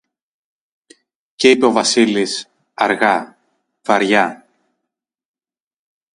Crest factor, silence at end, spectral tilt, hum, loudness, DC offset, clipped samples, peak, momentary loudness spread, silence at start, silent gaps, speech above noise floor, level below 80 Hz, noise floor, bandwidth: 18 dB; 1.8 s; -3 dB/octave; none; -15 LUFS; under 0.1%; under 0.1%; 0 dBFS; 14 LU; 1.4 s; none; 67 dB; -64 dBFS; -81 dBFS; 11.5 kHz